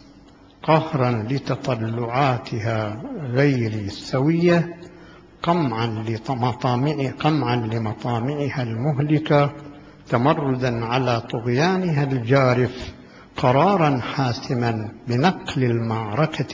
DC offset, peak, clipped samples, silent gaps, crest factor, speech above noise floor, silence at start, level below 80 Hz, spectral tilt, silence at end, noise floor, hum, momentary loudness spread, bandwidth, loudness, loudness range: under 0.1%; -2 dBFS; under 0.1%; none; 20 dB; 27 dB; 0.65 s; -50 dBFS; -7.5 dB/octave; 0 s; -48 dBFS; none; 8 LU; 7.6 kHz; -22 LUFS; 3 LU